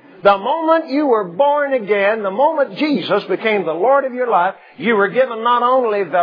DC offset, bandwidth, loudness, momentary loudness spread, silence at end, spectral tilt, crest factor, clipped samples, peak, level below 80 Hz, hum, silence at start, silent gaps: under 0.1%; 5.2 kHz; -16 LUFS; 3 LU; 0 s; -7.5 dB/octave; 16 dB; under 0.1%; 0 dBFS; -66 dBFS; none; 0.25 s; none